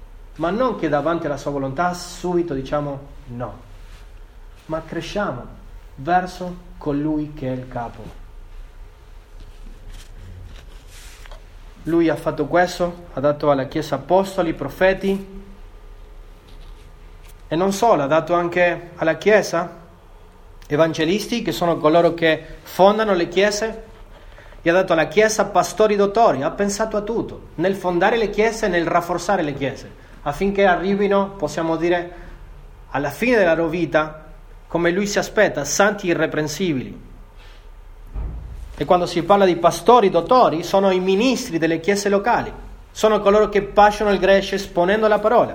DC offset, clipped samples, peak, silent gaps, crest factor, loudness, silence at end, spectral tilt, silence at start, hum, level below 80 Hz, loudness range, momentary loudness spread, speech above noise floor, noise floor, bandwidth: under 0.1%; under 0.1%; 0 dBFS; none; 20 dB; -19 LUFS; 0 s; -5 dB/octave; 0 s; none; -40 dBFS; 10 LU; 15 LU; 25 dB; -44 dBFS; 18 kHz